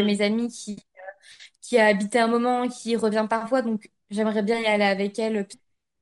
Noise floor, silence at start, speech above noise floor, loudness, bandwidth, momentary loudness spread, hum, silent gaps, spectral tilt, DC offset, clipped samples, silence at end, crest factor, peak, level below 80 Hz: -50 dBFS; 0 s; 27 dB; -23 LUFS; 11.5 kHz; 17 LU; none; none; -5 dB/octave; under 0.1%; under 0.1%; 0.45 s; 18 dB; -6 dBFS; -72 dBFS